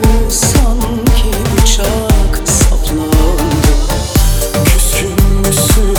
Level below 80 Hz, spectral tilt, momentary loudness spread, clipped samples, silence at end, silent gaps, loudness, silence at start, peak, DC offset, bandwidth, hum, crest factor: -12 dBFS; -4.5 dB/octave; 3 LU; under 0.1%; 0 s; none; -12 LUFS; 0 s; 0 dBFS; under 0.1%; over 20 kHz; none; 10 dB